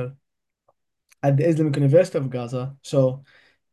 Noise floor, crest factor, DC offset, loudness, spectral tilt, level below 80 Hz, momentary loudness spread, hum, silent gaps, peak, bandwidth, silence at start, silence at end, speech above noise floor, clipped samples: -79 dBFS; 18 dB; under 0.1%; -21 LUFS; -8 dB/octave; -64 dBFS; 13 LU; none; none; -4 dBFS; 11.5 kHz; 0 s; 0.55 s; 58 dB; under 0.1%